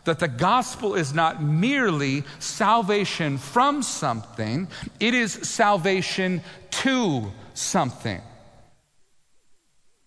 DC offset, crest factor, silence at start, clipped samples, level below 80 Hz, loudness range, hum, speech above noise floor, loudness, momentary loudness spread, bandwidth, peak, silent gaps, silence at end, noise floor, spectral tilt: under 0.1%; 18 dB; 0.05 s; under 0.1%; -58 dBFS; 5 LU; none; 36 dB; -23 LUFS; 9 LU; 11 kHz; -6 dBFS; none; 1.7 s; -60 dBFS; -4.5 dB/octave